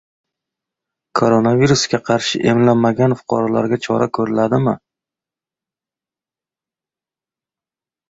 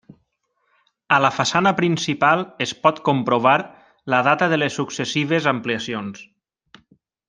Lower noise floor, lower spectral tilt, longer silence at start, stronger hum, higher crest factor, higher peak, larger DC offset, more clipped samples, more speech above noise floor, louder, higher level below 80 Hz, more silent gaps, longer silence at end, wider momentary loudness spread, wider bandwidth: first, under -90 dBFS vs -70 dBFS; about the same, -5.5 dB/octave vs -4.5 dB/octave; about the same, 1.15 s vs 1.1 s; neither; about the same, 16 dB vs 20 dB; about the same, -2 dBFS vs -2 dBFS; neither; neither; first, over 75 dB vs 51 dB; first, -16 LUFS vs -19 LUFS; first, -52 dBFS vs -64 dBFS; neither; first, 3.35 s vs 1.05 s; second, 5 LU vs 10 LU; second, 8 kHz vs 10 kHz